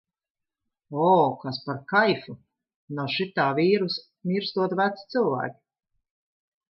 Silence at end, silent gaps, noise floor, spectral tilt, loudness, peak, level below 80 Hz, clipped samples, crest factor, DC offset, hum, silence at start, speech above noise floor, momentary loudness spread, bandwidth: 1.15 s; 2.76-2.88 s; -83 dBFS; -8 dB/octave; -25 LUFS; -8 dBFS; -74 dBFS; under 0.1%; 18 dB; under 0.1%; none; 0.9 s; 59 dB; 12 LU; 6 kHz